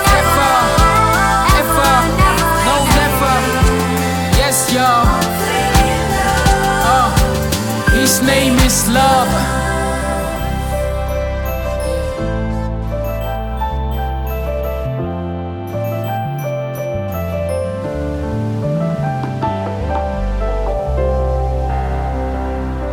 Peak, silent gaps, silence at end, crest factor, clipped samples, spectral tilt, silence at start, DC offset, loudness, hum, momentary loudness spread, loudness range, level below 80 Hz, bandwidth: 0 dBFS; none; 0 s; 14 dB; under 0.1%; -4.5 dB/octave; 0 s; under 0.1%; -15 LUFS; none; 10 LU; 9 LU; -22 dBFS; 20 kHz